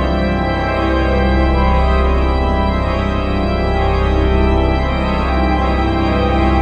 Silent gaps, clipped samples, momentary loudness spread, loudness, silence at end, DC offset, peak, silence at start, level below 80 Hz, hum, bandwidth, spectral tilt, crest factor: none; under 0.1%; 3 LU; -16 LUFS; 0 s; under 0.1%; -2 dBFS; 0 s; -18 dBFS; none; 6.6 kHz; -8 dB/octave; 12 dB